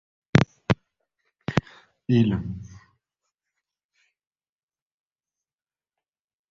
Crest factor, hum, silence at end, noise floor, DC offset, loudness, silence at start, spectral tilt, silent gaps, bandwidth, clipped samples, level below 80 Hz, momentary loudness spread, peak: 28 dB; none; 3.85 s; under -90 dBFS; under 0.1%; -25 LUFS; 0.35 s; -7.5 dB/octave; none; 7.6 kHz; under 0.1%; -50 dBFS; 18 LU; 0 dBFS